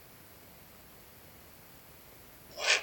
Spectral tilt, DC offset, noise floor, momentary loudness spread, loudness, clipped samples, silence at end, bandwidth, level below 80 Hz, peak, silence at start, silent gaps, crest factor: 0.5 dB/octave; under 0.1%; -54 dBFS; 15 LU; -32 LUFS; under 0.1%; 0 s; over 20 kHz; -68 dBFS; -10 dBFS; 1.9 s; none; 28 dB